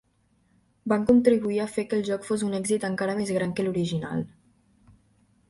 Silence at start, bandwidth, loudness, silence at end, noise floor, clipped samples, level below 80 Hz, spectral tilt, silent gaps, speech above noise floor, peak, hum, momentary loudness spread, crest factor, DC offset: 0.85 s; 11.5 kHz; -26 LUFS; 1.2 s; -67 dBFS; under 0.1%; -58 dBFS; -6 dB/octave; none; 42 dB; -6 dBFS; none; 11 LU; 20 dB; under 0.1%